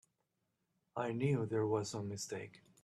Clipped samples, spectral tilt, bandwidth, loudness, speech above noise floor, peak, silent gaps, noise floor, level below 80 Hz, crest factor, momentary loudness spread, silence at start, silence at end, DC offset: under 0.1%; -6 dB/octave; 13.5 kHz; -39 LUFS; 47 dB; -22 dBFS; none; -85 dBFS; -78 dBFS; 18 dB; 12 LU; 0.95 s; 0.25 s; under 0.1%